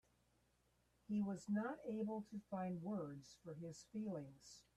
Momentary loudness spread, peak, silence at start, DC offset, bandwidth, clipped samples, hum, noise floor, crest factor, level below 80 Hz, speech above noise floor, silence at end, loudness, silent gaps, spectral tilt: 11 LU; -32 dBFS; 1.1 s; under 0.1%; 11 kHz; under 0.1%; none; -80 dBFS; 14 dB; -80 dBFS; 33 dB; 0.15 s; -47 LUFS; none; -7 dB/octave